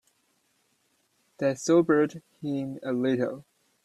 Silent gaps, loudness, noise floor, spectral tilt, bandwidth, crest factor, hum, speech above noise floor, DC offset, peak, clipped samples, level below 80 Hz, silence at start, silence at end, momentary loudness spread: none; -27 LUFS; -71 dBFS; -6 dB/octave; 12.5 kHz; 18 dB; none; 45 dB; under 0.1%; -10 dBFS; under 0.1%; -70 dBFS; 1.4 s; 0.45 s; 12 LU